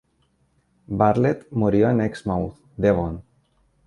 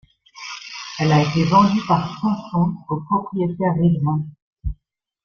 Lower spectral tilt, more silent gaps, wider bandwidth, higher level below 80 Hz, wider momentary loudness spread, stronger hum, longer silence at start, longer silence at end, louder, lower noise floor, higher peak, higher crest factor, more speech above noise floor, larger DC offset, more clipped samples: first, -9 dB/octave vs -7 dB/octave; second, none vs 4.42-4.56 s; first, 11 kHz vs 7 kHz; about the same, -44 dBFS vs -42 dBFS; second, 13 LU vs 17 LU; neither; first, 0.9 s vs 0.35 s; first, 0.65 s vs 0.5 s; second, -22 LUFS vs -19 LUFS; about the same, -65 dBFS vs -67 dBFS; about the same, -4 dBFS vs -2 dBFS; about the same, 20 dB vs 18 dB; about the same, 45 dB vs 48 dB; neither; neither